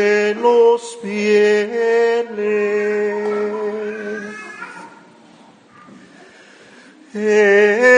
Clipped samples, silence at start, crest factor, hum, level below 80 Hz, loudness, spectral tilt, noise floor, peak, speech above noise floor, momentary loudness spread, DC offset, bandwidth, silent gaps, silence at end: under 0.1%; 0 s; 16 dB; none; -68 dBFS; -16 LUFS; -4.5 dB/octave; -46 dBFS; 0 dBFS; 31 dB; 19 LU; under 0.1%; 10 kHz; none; 0 s